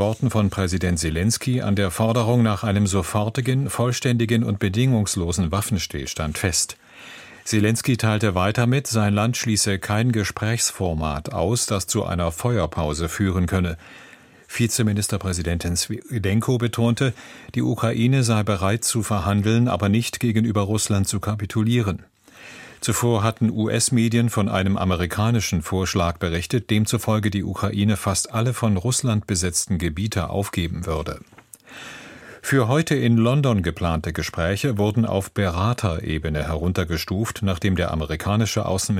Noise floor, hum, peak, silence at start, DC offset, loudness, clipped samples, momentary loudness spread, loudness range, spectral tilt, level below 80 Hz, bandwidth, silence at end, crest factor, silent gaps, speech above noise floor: -44 dBFS; none; -4 dBFS; 0 s; under 0.1%; -22 LUFS; under 0.1%; 7 LU; 3 LU; -5 dB/octave; -40 dBFS; 16.5 kHz; 0 s; 18 dB; none; 23 dB